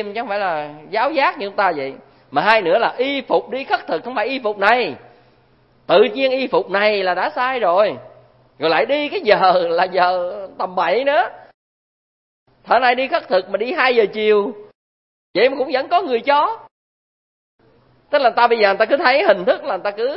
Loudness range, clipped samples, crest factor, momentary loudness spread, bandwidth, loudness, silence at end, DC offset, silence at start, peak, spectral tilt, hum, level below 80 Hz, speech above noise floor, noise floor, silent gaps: 3 LU; under 0.1%; 18 dB; 9 LU; 5.8 kHz; -17 LUFS; 0 s; under 0.1%; 0 s; 0 dBFS; -6.5 dB/octave; none; -66 dBFS; 38 dB; -55 dBFS; 11.54-12.46 s, 14.75-15.34 s, 16.71-17.59 s